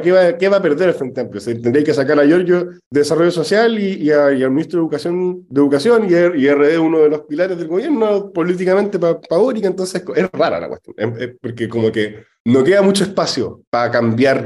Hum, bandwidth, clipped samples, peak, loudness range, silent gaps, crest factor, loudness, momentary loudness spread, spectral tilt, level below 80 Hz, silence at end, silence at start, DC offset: none; 12 kHz; under 0.1%; -4 dBFS; 4 LU; 2.86-2.91 s, 12.40-12.45 s, 13.67-13.72 s; 12 dB; -15 LUFS; 10 LU; -6 dB/octave; -60 dBFS; 0 s; 0 s; under 0.1%